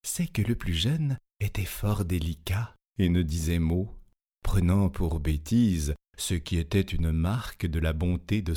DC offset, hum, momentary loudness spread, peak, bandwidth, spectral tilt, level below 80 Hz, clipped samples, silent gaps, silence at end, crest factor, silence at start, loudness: under 0.1%; none; 7 LU; -12 dBFS; 18 kHz; -6 dB/octave; -36 dBFS; under 0.1%; none; 0 s; 14 dB; 0.05 s; -28 LUFS